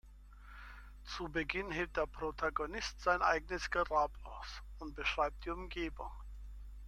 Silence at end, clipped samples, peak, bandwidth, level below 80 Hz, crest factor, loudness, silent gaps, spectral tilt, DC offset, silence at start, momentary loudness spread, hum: 0 s; under 0.1%; -18 dBFS; 13.5 kHz; -50 dBFS; 22 dB; -37 LUFS; none; -4 dB/octave; under 0.1%; 0.05 s; 20 LU; 50 Hz at -50 dBFS